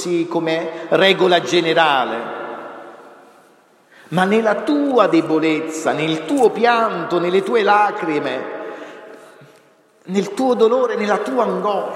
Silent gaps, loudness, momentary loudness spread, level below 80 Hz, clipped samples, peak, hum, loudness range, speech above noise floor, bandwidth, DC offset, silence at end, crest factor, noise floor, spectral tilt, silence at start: none; -17 LUFS; 15 LU; -72 dBFS; under 0.1%; 0 dBFS; none; 4 LU; 36 dB; 13 kHz; under 0.1%; 0 s; 18 dB; -52 dBFS; -5 dB/octave; 0 s